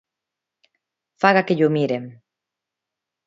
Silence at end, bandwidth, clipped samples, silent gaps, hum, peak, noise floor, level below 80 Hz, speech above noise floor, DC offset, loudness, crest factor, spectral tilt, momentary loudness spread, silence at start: 1.15 s; 7.8 kHz; under 0.1%; none; none; 0 dBFS; -85 dBFS; -68 dBFS; 67 dB; under 0.1%; -19 LUFS; 24 dB; -7.5 dB/octave; 11 LU; 1.2 s